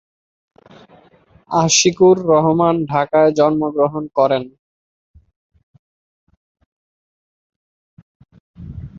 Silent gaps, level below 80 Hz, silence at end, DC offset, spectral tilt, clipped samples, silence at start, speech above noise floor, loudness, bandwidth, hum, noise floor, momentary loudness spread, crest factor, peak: 4.59-5.14 s, 5.36-5.50 s, 5.63-6.27 s, 6.37-6.55 s, 6.66-7.50 s, 7.56-8.20 s, 8.40-8.54 s; -50 dBFS; 0 s; under 0.1%; -4.5 dB/octave; under 0.1%; 1.5 s; 37 dB; -15 LUFS; 8 kHz; none; -51 dBFS; 10 LU; 18 dB; -2 dBFS